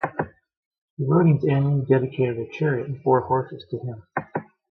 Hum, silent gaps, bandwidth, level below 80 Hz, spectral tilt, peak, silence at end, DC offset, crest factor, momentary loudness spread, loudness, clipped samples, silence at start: none; 0.57-0.71 s, 0.78-0.97 s; 4.7 kHz; -58 dBFS; -10.5 dB/octave; -6 dBFS; 0.3 s; under 0.1%; 18 dB; 13 LU; -23 LUFS; under 0.1%; 0 s